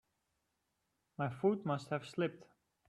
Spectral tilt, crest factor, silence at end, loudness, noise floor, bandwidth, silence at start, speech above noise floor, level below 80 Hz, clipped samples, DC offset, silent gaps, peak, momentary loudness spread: -7.5 dB/octave; 20 dB; 0.45 s; -38 LUFS; -84 dBFS; 12 kHz; 1.2 s; 47 dB; -80 dBFS; under 0.1%; under 0.1%; none; -20 dBFS; 7 LU